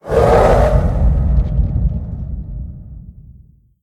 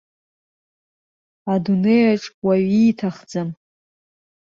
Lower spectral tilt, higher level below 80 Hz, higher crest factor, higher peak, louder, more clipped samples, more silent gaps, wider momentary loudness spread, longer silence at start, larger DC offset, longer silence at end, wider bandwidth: about the same, -8 dB/octave vs -7.5 dB/octave; first, -18 dBFS vs -62 dBFS; about the same, 16 dB vs 16 dB; first, 0 dBFS vs -6 dBFS; first, -15 LUFS vs -19 LUFS; neither; second, none vs 2.34-2.42 s; first, 20 LU vs 12 LU; second, 0.05 s vs 1.45 s; neither; second, 0.7 s vs 1.05 s; first, 10.5 kHz vs 7.4 kHz